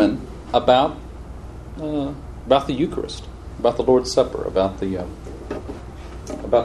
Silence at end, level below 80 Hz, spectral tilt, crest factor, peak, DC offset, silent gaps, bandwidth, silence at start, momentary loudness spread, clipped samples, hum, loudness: 0 s; -38 dBFS; -6 dB/octave; 20 dB; -2 dBFS; under 0.1%; none; 12 kHz; 0 s; 19 LU; under 0.1%; none; -21 LUFS